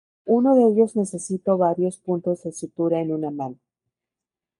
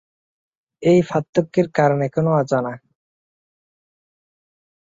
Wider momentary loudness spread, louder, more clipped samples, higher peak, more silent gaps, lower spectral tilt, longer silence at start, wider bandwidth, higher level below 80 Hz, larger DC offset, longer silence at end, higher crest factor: first, 13 LU vs 6 LU; second, -22 LUFS vs -19 LUFS; neither; second, -6 dBFS vs -2 dBFS; second, none vs 1.29-1.33 s; about the same, -8 dB/octave vs -8 dB/octave; second, 0.25 s vs 0.8 s; first, 11.5 kHz vs 7.8 kHz; second, -70 dBFS vs -60 dBFS; neither; second, 1.05 s vs 2.1 s; about the same, 16 dB vs 20 dB